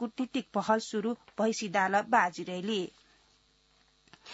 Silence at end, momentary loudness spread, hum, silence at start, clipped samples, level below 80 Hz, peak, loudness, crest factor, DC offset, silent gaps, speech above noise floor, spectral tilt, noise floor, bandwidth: 0 s; 9 LU; none; 0 s; under 0.1%; -76 dBFS; -12 dBFS; -31 LUFS; 22 dB; under 0.1%; none; 37 dB; -3 dB/octave; -67 dBFS; 8 kHz